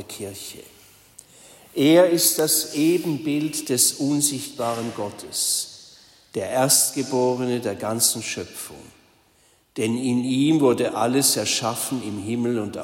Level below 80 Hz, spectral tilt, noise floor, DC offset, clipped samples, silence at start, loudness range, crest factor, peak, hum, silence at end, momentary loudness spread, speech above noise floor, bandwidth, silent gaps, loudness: -66 dBFS; -3.5 dB/octave; -60 dBFS; under 0.1%; under 0.1%; 0 s; 4 LU; 20 dB; -4 dBFS; none; 0 s; 16 LU; 38 dB; 16.5 kHz; none; -21 LUFS